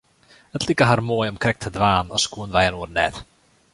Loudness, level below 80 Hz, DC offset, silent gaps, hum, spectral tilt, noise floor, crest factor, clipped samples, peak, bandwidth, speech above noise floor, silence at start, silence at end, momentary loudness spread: -21 LUFS; -44 dBFS; under 0.1%; none; none; -4.5 dB/octave; -54 dBFS; 20 dB; under 0.1%; -2 dBFS; 11.5 kHz; 33 dB; 0.55 s; 0.5 s; 7 LU